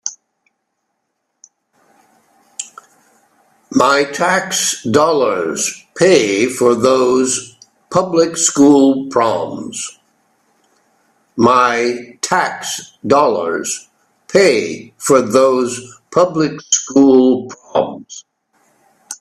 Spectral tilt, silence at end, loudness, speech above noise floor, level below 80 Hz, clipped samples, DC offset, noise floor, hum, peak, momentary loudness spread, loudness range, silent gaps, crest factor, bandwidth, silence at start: -3.5 dB/octave; 0.05 s; -14 LUFS; 57 dB; -58 dBFS; under 0.1%; under 0.1%; -71 dBFS; none; 0 dBFS; 15 LU; 5 LU; none; 16 dB; 14 kHz; 0.05 s